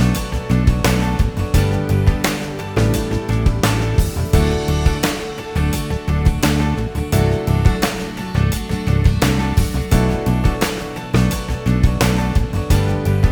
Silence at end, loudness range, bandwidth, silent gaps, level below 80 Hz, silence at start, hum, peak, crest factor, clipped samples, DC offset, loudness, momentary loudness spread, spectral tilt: 0 s; 1 LU; over 20 kHz; none; -22 dBFS; 0 s; none; -2 dBFS; 14 dB; under 0.1%; under 0.1%; -18 LUFS; 5 LU; -6 dB/octave